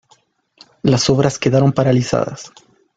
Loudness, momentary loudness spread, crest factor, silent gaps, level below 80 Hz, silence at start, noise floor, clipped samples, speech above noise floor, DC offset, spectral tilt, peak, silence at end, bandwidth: -16 LUFS; 8 LU; 16 dB; none; -48 dBFS; 0.85 s; -56 dBFS; under 0.1%; 41 dB; under 0.1%; -6 dB/octave; -2 dBFS; 0.5 s; 9.2 kHz